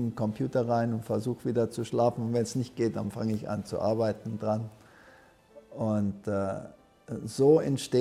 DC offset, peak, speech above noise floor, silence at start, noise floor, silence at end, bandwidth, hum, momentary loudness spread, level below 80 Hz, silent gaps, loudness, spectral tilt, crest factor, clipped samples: under 0.1%; -10 dBFS; 28 dB; 0 s; -57 dBFS; 0 s; 14.5 kHz; none; 10 LU; -64 dBFS; none; -29 LUFS; -7 dB/octave; 18 dB; under 0.1%